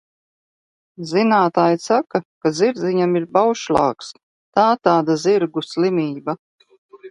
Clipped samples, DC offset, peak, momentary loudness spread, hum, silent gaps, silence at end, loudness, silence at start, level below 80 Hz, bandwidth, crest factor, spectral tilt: under 0.1%; under 0.1%; 0 dBFS; 11 LU; none; 2.25-2.41 s, 4.23-4.52 s, 6.39-6.59 s, 6.78-6.89 s; 0 s; -18 LUFS; 1 s; -58 dBFS; 11 kHz; 18 dB; -6 dB/octave